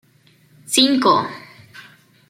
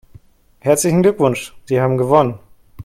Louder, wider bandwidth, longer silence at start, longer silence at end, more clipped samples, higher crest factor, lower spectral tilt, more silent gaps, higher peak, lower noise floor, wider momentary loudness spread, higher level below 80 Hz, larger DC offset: about the same, -16 LUFS vs -16 LUFS; about the same, 16.5 kHz vs 16 kHz; about the same, 0.7 s vs 0.65 s; first, 0.5 s vs 0 s; neither; about the same, 20 dB vs 16 dB; second, -2.5 dB/octave vs -6 dB/octave; neither; about the same, -2 dBFS vs 0 dBFS; first, -55 dBFS vs -46 dBFS; first, 17 LU vs 10 LU; second, -68 dBFS vs -50 dBFS; neither